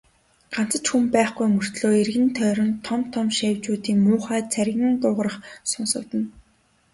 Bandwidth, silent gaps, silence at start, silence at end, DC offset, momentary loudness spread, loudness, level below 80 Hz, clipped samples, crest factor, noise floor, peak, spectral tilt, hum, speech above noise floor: 11.5 kHz; none; 0.5 s; 0.55 s; under 0.1%; 8 LU; -22 LUFS; -60 dBFS; under 0.1%; 18 dB; -62 dBFS; -4 dBFS; -4.5 dB/octave; none; 40 dB